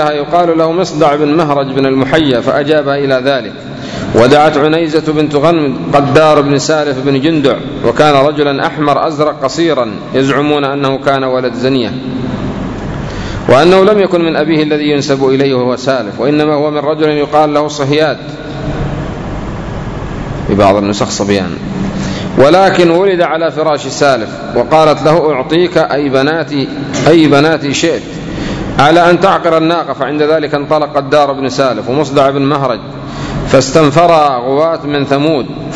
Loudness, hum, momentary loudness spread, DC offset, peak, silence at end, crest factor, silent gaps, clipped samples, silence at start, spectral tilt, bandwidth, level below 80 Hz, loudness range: -11 LUFS; none; 11 LU; under 0.1%; 0 dBFS; 0 s; 10 dB; none; 2%; 0 s; -5.5 dB/octave; 11 kHz; -34 dBFS; 4 LU